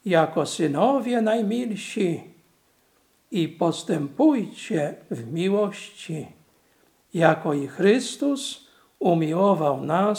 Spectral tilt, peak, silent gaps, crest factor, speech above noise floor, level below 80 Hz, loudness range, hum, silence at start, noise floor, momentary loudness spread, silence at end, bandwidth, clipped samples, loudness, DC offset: -6 dB/octave; -2 dBFS; none; 20 dB; 41 dB; -76 dBFS; 3 LU; none; 0.05 s; -64 dBFS; 13 LU; 0 s; 16.5 kHz; under 0.1%; -24 LUFS; under 0.1%